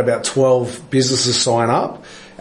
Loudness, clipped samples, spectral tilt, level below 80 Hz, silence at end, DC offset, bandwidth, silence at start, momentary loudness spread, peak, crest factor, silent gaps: -16 LUFS; under 0.1%; -4 dB/octave; -56 dBFS; 0.15 s; under 0.1%; 11.5 kHz; 0 s; 6 LU; -4 dBFS; 14 dB; none